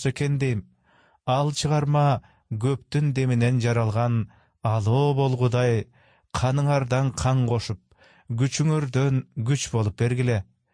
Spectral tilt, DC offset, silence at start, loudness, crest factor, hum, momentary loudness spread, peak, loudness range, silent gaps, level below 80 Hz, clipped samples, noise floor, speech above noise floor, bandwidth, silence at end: -6.5 dB/octave; under 0.1%; 0 s; -24 LUFS; 12 dB; none; 8 LU; -12 dBFS; 2 LU; none; -50 dBFS; under 0.1%; -61 dBFS; 38 dB; 10.5 kHz; 0.3 s